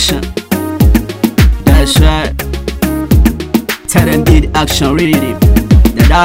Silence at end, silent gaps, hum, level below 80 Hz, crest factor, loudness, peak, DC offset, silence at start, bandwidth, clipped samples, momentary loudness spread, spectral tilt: 0 s; none; none; -14 dBFS; 10 dB; -11 LUFS; 0 dBFS; under 0.1%; 0 s; 16.5 kHz; 2%; 8 LU; -5.5 dB/octave